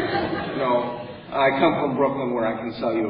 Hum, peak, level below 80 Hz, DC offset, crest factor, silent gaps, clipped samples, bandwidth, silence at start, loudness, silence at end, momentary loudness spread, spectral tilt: none; -4 dBFS; -54 dBFS; under 0.1%; 18 dB; none; under 0.1%; 5.4 kHz; 0 s; -23 LUFS; 0 s; 9 LU; -10.5 dB/octave